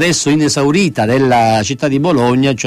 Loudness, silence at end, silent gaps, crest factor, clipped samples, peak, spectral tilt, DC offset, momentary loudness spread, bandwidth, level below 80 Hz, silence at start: -12 LUFS; 0 s; none; 10 dB; under 0.1%; -2 dBFS; -5 dB/octave; under 0.1%; 3 LU; 15 kHz; -44 dBFS; 0 s